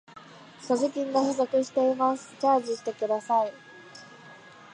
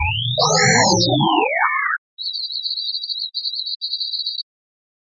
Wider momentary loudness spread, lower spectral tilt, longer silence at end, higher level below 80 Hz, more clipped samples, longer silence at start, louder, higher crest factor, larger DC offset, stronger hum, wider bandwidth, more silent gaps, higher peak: first, 22 LU vs 11 LU; first, -4.5 dB/octave vs -3 dB/octave; second, 0.35 s vs 0.6 s; second, -82 dBFS vs -44 dBFS; neither; first, 0.15 s vs 0 s; second, -27 LUFS vs -18 LUFS; about the same, 16 dB vs 18 dB; neither; neither; first, 10 kHz vs 7.8 kHz; second, none vs 1.98-2.17 s, 3.76-3.80 s; second, -10 dBFS vs -2 dBFS